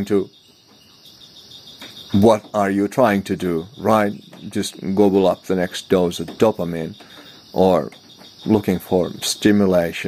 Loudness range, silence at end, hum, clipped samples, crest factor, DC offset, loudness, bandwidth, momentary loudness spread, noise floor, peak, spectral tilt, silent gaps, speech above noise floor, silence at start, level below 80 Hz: 2 LU; 0 s; none; under 0.1%; 18 dB; under 0.1%; -19 LUFS; 16 kHz; 19 LU; -50 dBFS; 0 dBFS; -5.5 dB/octave; none; 32 dB; 0 s; -54 dBFS